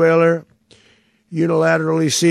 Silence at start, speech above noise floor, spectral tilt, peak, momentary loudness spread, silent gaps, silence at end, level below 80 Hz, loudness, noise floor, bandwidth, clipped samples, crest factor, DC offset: 0 s; 41 dB; -5 dB/octave; -4 dBFS; 9 LU; none; 0 s; -70 dBFS; -16 LUFS; -56 dBFS; 13.5 kHz; under 0.1%; 14 dB; under 0.1%